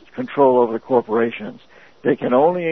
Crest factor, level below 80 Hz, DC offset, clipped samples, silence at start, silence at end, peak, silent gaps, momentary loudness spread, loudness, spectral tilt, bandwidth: 16 dB; -66 dBFS; 0.3%; under 0.1%; 0.15 s; 0 s; -2 dBFS; none; 11 LU; -18 LUFS; -9 dB/octave; 5.8 kHz